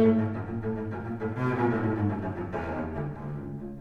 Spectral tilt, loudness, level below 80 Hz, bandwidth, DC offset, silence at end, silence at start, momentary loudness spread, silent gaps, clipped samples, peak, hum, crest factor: -10 dB/octave; -31 LUFS; -50 dBFS; 6.2 kHz; under 0.1%; 0 s; 0 s; 9 LU; none; under 0.1%; -12 dBFS; none; 16 dB